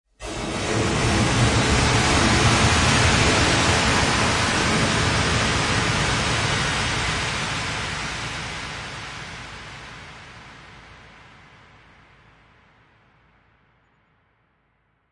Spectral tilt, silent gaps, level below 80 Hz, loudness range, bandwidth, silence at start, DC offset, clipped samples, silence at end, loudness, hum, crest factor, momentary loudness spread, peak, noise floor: -3.5 dB/octave; none; -36 dBFS; 18 LU; 11.5 kHz; 0.2 s; under 0.1%; under 0.1%; 4.15 s; -20 LUFS; none; 18 dB; 19 LU; -4 dBFS; -67 dBFS